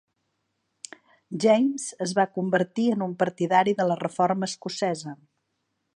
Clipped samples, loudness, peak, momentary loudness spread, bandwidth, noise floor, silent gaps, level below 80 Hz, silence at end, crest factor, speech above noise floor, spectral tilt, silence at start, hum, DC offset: under 0.1%; -25 LUFS; -6 dBFS; 18 LU; 11 kHz; -77 dBFS; none; -76 dBFS; 0.85 s; 20 dB; 53 dB; -5 dB/octave; 1.3 s; none; under 0.1%